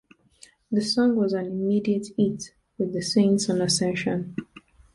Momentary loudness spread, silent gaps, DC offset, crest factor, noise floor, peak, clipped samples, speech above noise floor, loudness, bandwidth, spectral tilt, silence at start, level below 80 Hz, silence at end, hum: 10 LU; none; under 0.1%; 16 dB; -55 dBFS; -10 dBFS; under 0.1%; 32 dB; -24 LUFS; 11.5 kHz; -5 dB/octave; 0.7 s; -60 dBFS; 0.35 s; none